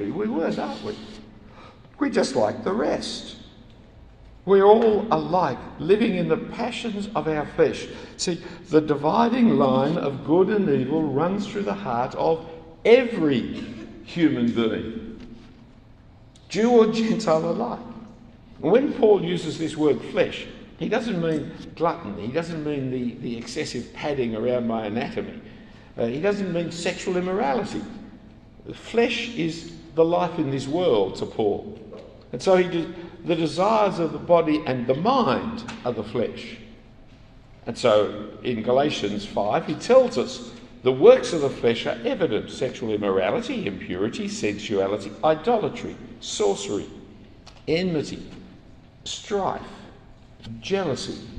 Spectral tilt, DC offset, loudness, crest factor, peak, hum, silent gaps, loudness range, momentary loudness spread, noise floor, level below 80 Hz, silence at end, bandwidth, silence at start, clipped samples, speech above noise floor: -5.5 dB/octave; under 0.1%; -23 LUFS; 22 dB; -2 dBFS; none; none; 6 LU; 17 LU; -49 dBFS; -52 dBFS; 0 s; 10 kHz; 0 s; under 0.1%; 26 dB